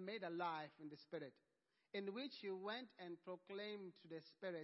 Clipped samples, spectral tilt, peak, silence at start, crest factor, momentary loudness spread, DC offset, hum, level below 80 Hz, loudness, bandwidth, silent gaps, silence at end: under 0.1%; -3 dB/octave; -34 dBFS; 0 s; 18 dB; 10 LU; under 0.1%; none; under -90 dBFS; -51 LUFS; 5.6 kHz; none; 0 s